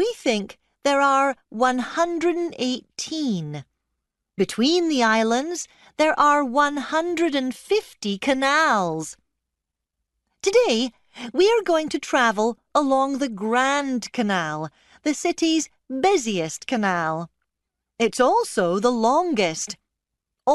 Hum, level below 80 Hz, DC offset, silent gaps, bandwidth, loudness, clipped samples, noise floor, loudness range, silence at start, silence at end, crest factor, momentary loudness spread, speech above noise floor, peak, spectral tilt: none; -62 dBFS; under 0.1%; none; 12 kHz; -22 LUFS; under 0.1%; -83 dBFS; 3 LU; 0 s; 0 s; 16 dB; 11 LU; 62 dB; -6 dBFS; -3.5 dB/octave